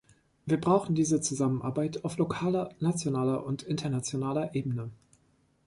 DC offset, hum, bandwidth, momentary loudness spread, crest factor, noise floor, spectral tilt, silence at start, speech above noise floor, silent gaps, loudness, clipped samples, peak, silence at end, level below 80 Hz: under 0.1%; none; 11.5 kHz; 7 LU; 18 dB; -68 dBFS; -6 dB/octave; 0.45 s; 39 dB; none; -30 LUFS; under 0.1%; -12 dBFS; 0.75 s; -62 dBFS